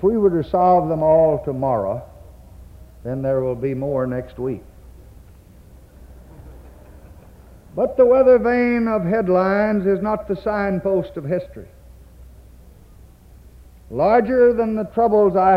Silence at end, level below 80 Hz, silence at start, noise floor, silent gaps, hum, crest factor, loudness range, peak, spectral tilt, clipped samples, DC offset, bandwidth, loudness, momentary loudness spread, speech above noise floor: 0 s; -44 dBFS; 0 s; -45 dBFS; none; none; 16 dB; 12 LU; -4 dBFS; -9.5 dB/octave; under 0.1%; under 0.1%; 5.6 kHz; -18 LUFS; 12 LU; 28 dB